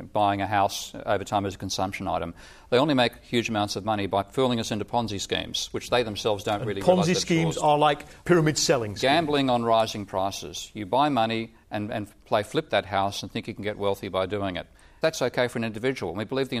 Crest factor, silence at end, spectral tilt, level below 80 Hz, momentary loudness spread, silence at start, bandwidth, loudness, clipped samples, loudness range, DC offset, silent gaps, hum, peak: 20 dB; 0 s; -4.5 dB/octave; -54 dBFS; 10 LU; 0 s; 15.5 kHz; -26 LUFS; under 0.1%; 5 LU; under 0.1%; none; none; -6 dBFS